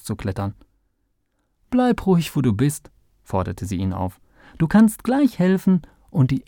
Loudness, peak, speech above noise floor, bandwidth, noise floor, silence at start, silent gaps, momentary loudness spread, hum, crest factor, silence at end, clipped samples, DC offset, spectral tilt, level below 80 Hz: -21 LUFS; -4 dBFS; 50 dB; 19 kHz; -69 dBFS; 0.05 s; none; 11 LU; none; 16 dB; 0.05 s; under 0.1%; under 0.1%; -7 dB/octave; -46 dBFS